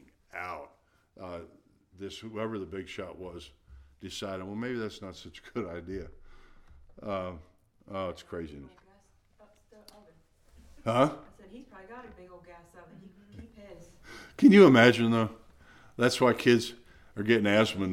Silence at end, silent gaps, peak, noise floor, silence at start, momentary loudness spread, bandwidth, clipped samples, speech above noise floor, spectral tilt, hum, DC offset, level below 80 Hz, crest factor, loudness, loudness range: 0 s; none; -6 dBFS; -64 dBFS; 0.35 s; 26 LU; 15.5 kHz; under 0.1%; 37 dB; -6 dB/octave; none; under 0.1%; -60 dBFS; 24 dB; -26 LUFS; 18 LU